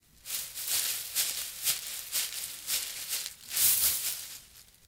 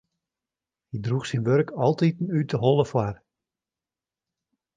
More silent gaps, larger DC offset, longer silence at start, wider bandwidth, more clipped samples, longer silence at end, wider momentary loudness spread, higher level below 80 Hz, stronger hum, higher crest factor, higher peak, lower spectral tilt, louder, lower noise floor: neither; neither; second, 0.25 s vs 0.95 s; first, 18 kHz vs 9.4 kHz; neither; second, 0.25 s vs 1.6 s; about the same, 12 LU vs 11 LU; second, -66 dBFS vs -60 dBFS; neither; about the same, 24 dB vs 20 dB; about the same, -8 dBFS vs -6 dBFS; second, 2.5 dB/octave vs -7.5 dB/octave; second, -29 LUFS vs -24 LUFS; second, -55 dBFS vs under -90 dBFS